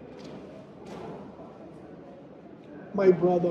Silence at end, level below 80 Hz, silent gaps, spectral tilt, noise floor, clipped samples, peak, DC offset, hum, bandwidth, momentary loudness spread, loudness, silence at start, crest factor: 0 s; -64 dBFS; none; -9 dB/octave; -47 dBFS; under 0.1%; -8 dBFS; under 0.1%; none; 6.8 kHz; 24 LU; -25 LUFS; 0 s; 20 dB